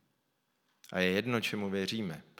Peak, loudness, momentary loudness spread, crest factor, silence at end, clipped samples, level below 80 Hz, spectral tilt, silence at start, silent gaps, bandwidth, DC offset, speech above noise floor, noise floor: -14 dBFS; -33 LUFS; 7 LU; 22 dB; 0.15 s; under 0.1%; -76 dBFS; -5 dB/octave; 0.9 s; none; 18 kHz; under 0.1%; 45 dB; -78 dBFS